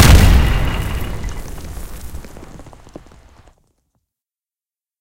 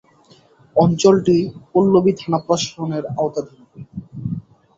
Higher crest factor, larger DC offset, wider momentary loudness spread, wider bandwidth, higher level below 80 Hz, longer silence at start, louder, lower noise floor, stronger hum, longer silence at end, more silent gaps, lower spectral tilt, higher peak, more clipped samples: about the same, 16 dB vs 18 dB; neither; first, 28 LU vs 18 LU; first, 17 kHz vs 7.8 kHz; first, -20 dBFS vs -52 dBFS; second, 0 s vs 0.75 s; about the same, -16 LUFS vs -18 LUFS; first, under -90 dBFS vs -51 dBFS; neither; first, 2.3 s vs 0.35 s; neither; second, -5 dB/octave vs -6.5 dB/octave; about the same, 0 dBFS vs -2 dBFS; first, 0.1% vs under 0.1%